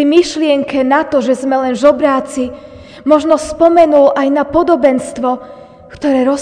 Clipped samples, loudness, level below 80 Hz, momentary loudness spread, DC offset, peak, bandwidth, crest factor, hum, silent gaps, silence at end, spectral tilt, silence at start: 0.4%; -12 LUFS; -44 dBFS; 10 LU; under 0.1%; 0 dBFS; 10 kHz; 12 dB; none; none; 0 s; -4.5 dB/octave; 0 s